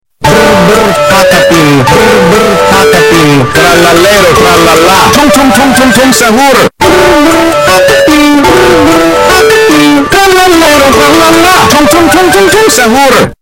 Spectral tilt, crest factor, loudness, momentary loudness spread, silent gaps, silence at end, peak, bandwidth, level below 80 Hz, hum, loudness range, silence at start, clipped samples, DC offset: -3.5 dB/octave; 4 dB; -3 LUFS; 2 LU; none; 0.05 s; 0 dBFS; over 20 kHz; -26 dBFS; none; 1 LU; 0.2 s; 2%; under 0.1%